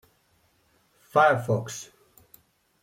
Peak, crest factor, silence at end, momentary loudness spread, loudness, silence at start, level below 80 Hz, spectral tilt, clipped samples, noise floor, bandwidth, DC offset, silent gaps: -8 dBFS; 22 dB; 1 s; 19 LU; -24 LUFS; 1.15 s; -68 dBFS; -5 dB/octave; under 0.1%; -66 dBFS; 16.5 kHz; under 0.1%; none